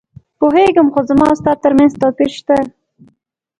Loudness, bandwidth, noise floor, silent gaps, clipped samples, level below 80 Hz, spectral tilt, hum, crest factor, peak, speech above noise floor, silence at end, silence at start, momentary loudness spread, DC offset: -12 LUFS; 10.5 kHz; -60 dBFS; none; under 0.1%; -44 dBFS; -6.5 dB/octave; none; 14 dB; 0 dBFS; 49 dB; 0.9 s; 0.4 s; 6 LU; under 0.1%